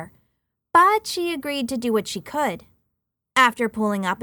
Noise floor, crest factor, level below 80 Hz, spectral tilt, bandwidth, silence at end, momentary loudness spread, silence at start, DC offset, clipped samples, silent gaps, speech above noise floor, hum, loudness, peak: -78 dBFS; 20 dB; -60 dBFS; -3.5 dB/octave; over 20 kHz; 0 s; 10 LU; 0 s; under 0.1%; under 0.1%; none; 57 dB; none; -21 LUFS; -4 dBFS